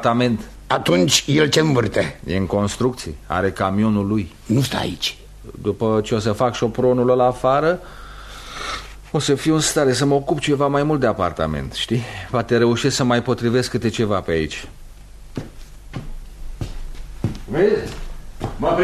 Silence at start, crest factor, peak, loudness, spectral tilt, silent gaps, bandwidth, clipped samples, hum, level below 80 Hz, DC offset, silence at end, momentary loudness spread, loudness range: 0 s; 18 dB; -2 dBFS; -19 LUFS; -5 dB/octave; none; 13.5 kHz; under 0.1%; none; -38 dBFS; under 0.1%; 0 s; 18 LU; 7 LU